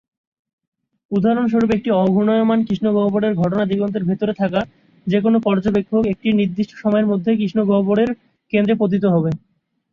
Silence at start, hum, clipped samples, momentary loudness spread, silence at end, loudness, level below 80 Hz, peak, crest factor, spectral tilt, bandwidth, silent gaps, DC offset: 1.1 s; none; under 0.1%; 6 LU; 0.55 s; -18 LUFS; -52 dBFS; -4 dBFS; 14 dB; -9 dB/octave; 6.6 kHz; none; under 0.1%